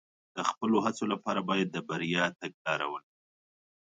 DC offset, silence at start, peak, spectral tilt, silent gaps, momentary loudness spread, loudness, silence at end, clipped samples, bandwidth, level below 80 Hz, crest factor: under 0.1%; 0.35 s; -12 dBFS; -5 dB/octave; 2.54-2.65 s; 8 LU; -31 LUFS; 0.95 s; under 0.1%; 9.4 kHz; -76 dBFS; 22 dB